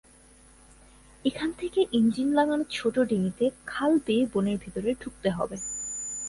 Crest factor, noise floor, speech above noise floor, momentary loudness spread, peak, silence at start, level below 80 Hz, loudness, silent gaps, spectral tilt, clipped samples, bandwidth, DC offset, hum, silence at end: 18 dB; -55 dBFS; 29 dB; 8 LU; -10 dBFS; 1.25 s; -56 dBFS; -27 LUFS; none; -4.5 dB/octave; under 0.1%; 11.5 kHz; under 0.1%; none; 0 s